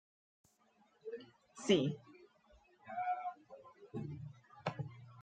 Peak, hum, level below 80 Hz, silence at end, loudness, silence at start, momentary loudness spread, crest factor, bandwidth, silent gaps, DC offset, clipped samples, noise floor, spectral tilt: -18 dBFS; none; -78 dBFS; 0 s; -41 LUFS; 1.05 s; 24 LU; 26 dB; 9 kHz; none; under 0.1%; under 0.1%; -73 dBFS; -5.5 dB/octave